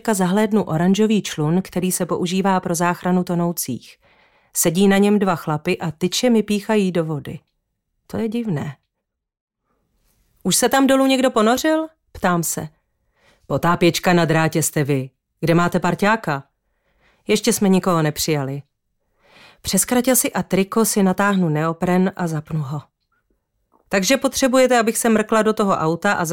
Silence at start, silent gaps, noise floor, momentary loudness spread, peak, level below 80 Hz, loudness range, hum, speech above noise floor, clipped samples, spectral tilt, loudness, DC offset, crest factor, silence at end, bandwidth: 0.05 s; 9.41-9.48 s; -79 dBFS; 11 LU; -6 dBFS; -52 dBFS; 3 LU; none; 61 dB; under 0.1%; -4.5 dB/octave; -18 LUFS; under 0.1%; 14 dB; 0 s; 17 kHz